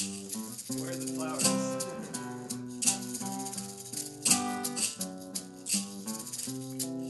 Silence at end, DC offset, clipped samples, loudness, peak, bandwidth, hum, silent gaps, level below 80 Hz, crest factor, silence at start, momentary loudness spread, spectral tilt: 0 s; under 0.1%; under 0.1%; -32 LUFS; -8 dBFS; 12 kHz; none; none; -74 dBFS; 26 dB; 0 s; 11 LU; -2.5 dB/octave